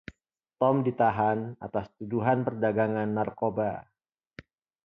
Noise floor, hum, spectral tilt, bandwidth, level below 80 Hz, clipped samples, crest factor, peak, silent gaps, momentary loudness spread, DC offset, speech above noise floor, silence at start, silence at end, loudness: -70 dBFS; none; -10.5 dB/octave; 5.8 kHz; -62 dBFS; under 0.1%; 18 dB; -10 dBFS; none; 10 LU; under 0.1%; 43 dB; 0.6 s; 1.05 s; -28 LUFS